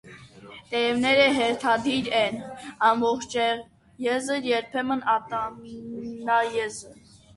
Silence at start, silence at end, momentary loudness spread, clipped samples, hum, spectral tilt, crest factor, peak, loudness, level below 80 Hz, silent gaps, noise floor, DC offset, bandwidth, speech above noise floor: 0.05 s; 0.45 s; 15 LU; under 0.1%; none; -3.5 dB/octave; 18 dB; -8 dBFS; -24 LUFS; -62 dBFS; none; -46 dBFS; under 0.1%; 11.5 kHz; 22 dB